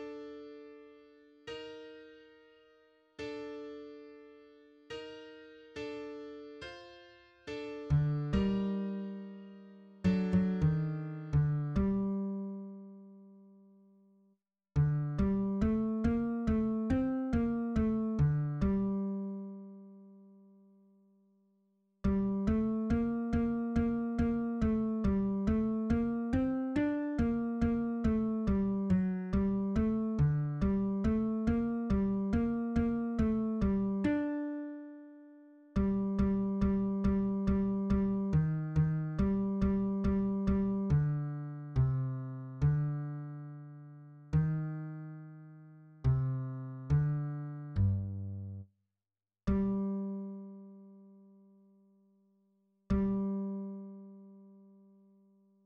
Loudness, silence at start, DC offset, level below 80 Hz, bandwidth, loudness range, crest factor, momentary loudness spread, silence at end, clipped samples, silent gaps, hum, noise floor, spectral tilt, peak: -33 LUFS; 0 s; under 0.1%; -46 dBFS; 6.8 kHz; 12 LU; 16 dB; 18 LU; 1.1 s; under 0.1%; none; none; under -90 dBFS; -10 dB/octave; -18 dBFS